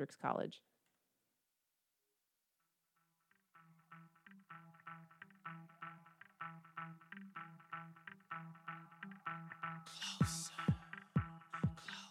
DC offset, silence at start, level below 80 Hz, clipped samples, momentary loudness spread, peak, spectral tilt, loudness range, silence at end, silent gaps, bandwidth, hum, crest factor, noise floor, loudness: under 0.1%; 0 s; -68 dBFS; under 0.1%; 20 LU; -22 dBFS; -5 dB/octave; 19 LU; 0 s; none; 15 kHz; none; 24 dB; -87 dBFS; -46 LUFS